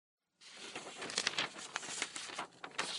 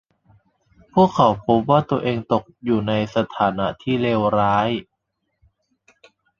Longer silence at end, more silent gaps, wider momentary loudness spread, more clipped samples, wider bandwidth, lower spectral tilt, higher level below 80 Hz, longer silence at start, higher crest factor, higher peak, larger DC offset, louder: second, 0 s vs 1.6 s; neither; first, 14 LU vs 7 LU; neither; first, 11.5 kHz vs 7.4 kHz; second, 0 dB/octave vs -7.5 dB/octave; second, -86 dBFS vs -52 dBFS; second, 0.4 s vs 0.95 s; first, 30 dB vs 20 dB; second, -14 dBFS vs -2 dBFS; neither; second, -40 LUFS vs -20 LUFS